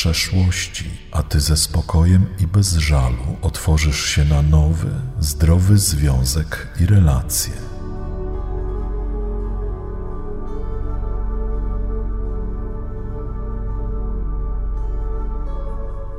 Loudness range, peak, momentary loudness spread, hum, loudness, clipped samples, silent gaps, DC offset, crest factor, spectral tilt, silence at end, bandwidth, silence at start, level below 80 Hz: 11 LU; -2 dBFS; 14 LU; none; -20 LUFS; under 0.1%; none; under 0.1%; 16 dB; -5 dB/octave; 0 s; 16 kHz; 0 s; -22 dBFS